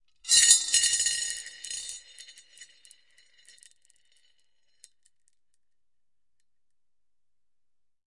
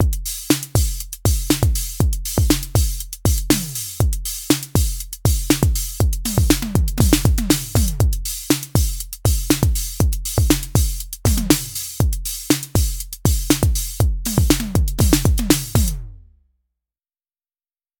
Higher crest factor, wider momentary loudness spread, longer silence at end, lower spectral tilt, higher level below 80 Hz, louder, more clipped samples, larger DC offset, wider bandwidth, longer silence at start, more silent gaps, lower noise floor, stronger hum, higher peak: first, 28 dB vs 18 dB; first, 20 LU vs 6 LU; first, 5.45 s vs 1.8 s; second, 4.5 dB/octave vs -4.5 dB/octave; second, -68 dBFS vs -24 dBFS; about the same, -21 LUFS vs -19 LUFS; neither; neither; second, 11.5 kHz vs over 20 kHz; first, 0.25 s vs 0 s; neither; about the same, under -90 dBFS vs under -90 dBFS; neither; second, -4 dBFS vs 0 dBFS